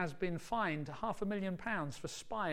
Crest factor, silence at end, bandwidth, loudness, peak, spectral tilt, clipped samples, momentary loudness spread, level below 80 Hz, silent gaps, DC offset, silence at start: 14 dB; 0 s; 16 kHz; -39 LUFS; -24 dBFS; -5.5 dB/octave; under 0.1%; 6 LU; -60 dBFS; none; under 0.1%; 0 s